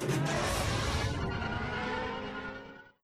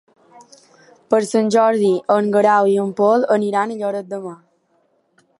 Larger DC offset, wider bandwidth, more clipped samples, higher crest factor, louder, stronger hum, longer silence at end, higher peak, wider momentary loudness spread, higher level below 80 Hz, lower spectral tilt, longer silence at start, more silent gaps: neither; first, 14.5 kHz vs 11.5 kHz; neither; about the same, 14 dB vs 18 dB; second, -34 LUFS vs -17 LUFS; neither; second, 0.15 s vs 1.05 s; second, -20 dBFS vs -2 dBFS; about the same, 11 LU vs 11 LU; first, -44 dBFS vs -72 dBFS; second, -4.5 dB/octave vs -6 dB/octave; second, 0 s vs 1.1 s; neither